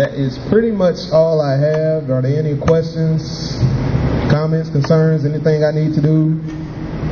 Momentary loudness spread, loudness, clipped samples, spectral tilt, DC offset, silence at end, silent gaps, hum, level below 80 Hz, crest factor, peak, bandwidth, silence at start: 7 LU; -16 LUFS; under 0.1%; -8 dB/octave; under 0.1%; 0 s; none; none; -32 dBFS; 14 dB; 0 dBFS; 6.8 kHz; 0 s